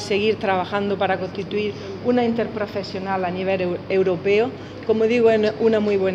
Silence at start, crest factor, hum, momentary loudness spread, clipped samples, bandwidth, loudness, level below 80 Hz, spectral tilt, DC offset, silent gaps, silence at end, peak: 0 s; 14 dB; none; 9 LU; under 0.1%; 9.2 kHz; -21 LUFS; -56 dBFS; -6.5 dB/octave; under 0.1%; none; 0 s; -6 dBFS